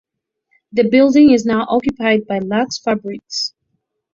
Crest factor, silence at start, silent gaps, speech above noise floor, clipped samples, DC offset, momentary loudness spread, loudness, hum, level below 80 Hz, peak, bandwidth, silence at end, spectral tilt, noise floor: 14 dB; 0.75 s; none; 56 dB; under 0.1%; under 0.1%; 12 LU; -15 LUFS; none; -52 dBFS; -2 dBFS; 7.6 kHz; 0.65 s; -5 dB/octave; -71 dBFS